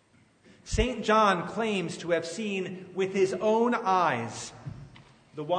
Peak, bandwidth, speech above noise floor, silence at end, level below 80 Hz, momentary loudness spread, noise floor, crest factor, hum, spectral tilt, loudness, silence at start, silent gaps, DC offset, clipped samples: -10 dBFS; 9.6 kHz; 33 dB; 0 s; -44 dBFS; 17 LU; -60 dBFS; 18 dB; none; -5 dB/octave; -27 LUFS; 0.65 s; none; under 0.1%; under 0.1%